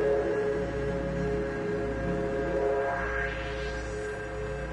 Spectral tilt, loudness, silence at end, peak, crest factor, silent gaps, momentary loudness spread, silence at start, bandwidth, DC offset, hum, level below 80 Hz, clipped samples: -6.5 dB/octave; -31 LUFS; 0 s; -18 dBFS; 12 dB; none; 7 LU; 0 s; 10.5 kHz; under 0.1%; none; -40 dBFS; under 0.1%